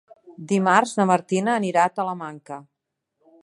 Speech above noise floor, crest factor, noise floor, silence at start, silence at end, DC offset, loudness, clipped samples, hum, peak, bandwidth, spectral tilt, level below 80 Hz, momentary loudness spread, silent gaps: 56 dB; 20 dB; -77 dBFS; 0.3 s; 0.85 s; under 0.1%; -21 LUFS; under 0.1%; none; -2 dBFS; 11.5 kHz; -5.5 dB/octave; -74 dBFS; 20 LU; none